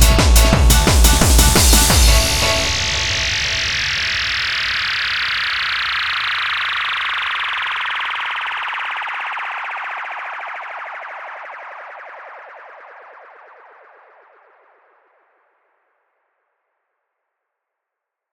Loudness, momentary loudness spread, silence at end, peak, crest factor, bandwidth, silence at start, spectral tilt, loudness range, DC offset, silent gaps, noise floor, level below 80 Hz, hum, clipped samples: -16 LUFS; 20 LU; 5.1 s; 0 dBFS; 18 dB; 19.5 kHz; 0 s; -2.5 dB/octave; 20 LU; under 0.1%; none; -82 dBFS; -22 dBFS; none; under 0.1%